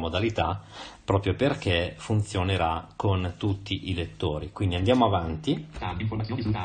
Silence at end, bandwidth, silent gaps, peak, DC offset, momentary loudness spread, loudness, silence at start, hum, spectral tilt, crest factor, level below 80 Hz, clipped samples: 0 s; 9.6 kHz; none; -8 dBFS; under 0.1%; 7 LU; -27 LUFS; 0 s; none; -6.5 dB/octave; 20 dB; -40 dBFS; under 0.1%